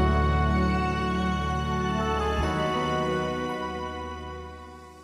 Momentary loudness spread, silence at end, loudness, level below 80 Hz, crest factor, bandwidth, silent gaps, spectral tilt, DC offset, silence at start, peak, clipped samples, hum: 14 LU; 0 s; -27 LUFS; -34 dBFS; 16 dB; 11.5 kHz; none; -6.5 dB/octave; under 0.1%; 0 s; -12 dBFS; under 0.1%; none